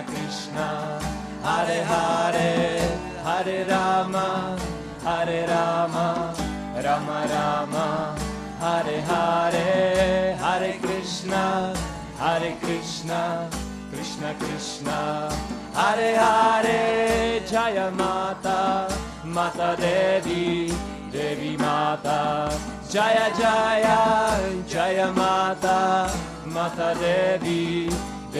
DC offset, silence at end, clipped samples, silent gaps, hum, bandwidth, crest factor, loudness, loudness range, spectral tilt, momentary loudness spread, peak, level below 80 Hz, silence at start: under 0.1%; 0 s; under 0.1%; none; none; 14 kHz; 18 dB; -24 LUFS; 5 LU; -4.5 dB/octave; 10 LU; -6 dBFS; -44 dBFS; 0 s